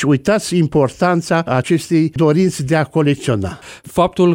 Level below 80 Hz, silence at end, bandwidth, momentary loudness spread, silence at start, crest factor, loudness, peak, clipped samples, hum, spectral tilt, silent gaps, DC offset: -44 dBFS; 0 s; 17 kHz; 6 LU; 0 s; 12 dB; -16 LUFS; -2 dBFS; under 0.1%; none; -6.5 dB/octave; none; under 0.1%